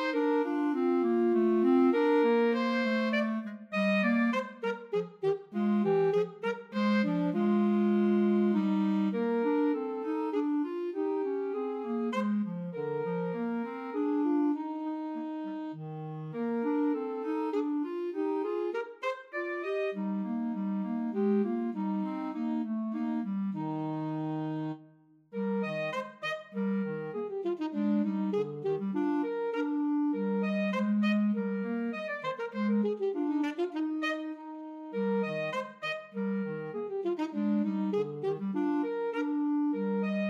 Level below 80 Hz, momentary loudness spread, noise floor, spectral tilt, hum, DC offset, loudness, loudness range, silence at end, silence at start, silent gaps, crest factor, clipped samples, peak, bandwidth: -88 dBFS; 9 LU; -60 dBFS; -8 dB/octave; none; under 0.1%; -31 LUFS; 6 LU; 0 s; 0 s; none; 14 dB; under 0.1%; -16 dBFS; 7.2 kHz